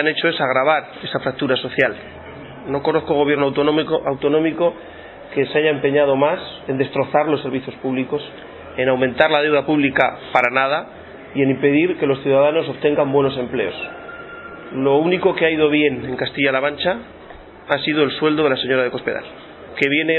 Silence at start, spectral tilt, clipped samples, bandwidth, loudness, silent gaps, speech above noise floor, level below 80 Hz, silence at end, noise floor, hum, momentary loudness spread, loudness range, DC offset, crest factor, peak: 0 s; -3.5 dB/octave; under 0.1%; 4.5 kHz; -18 LUFS; none; 21 dB; -54 dBFS; 0 s; -39 dBFS; none; 18 LU; 2 LU; under 0.1%; 18 dB; 0 dBFS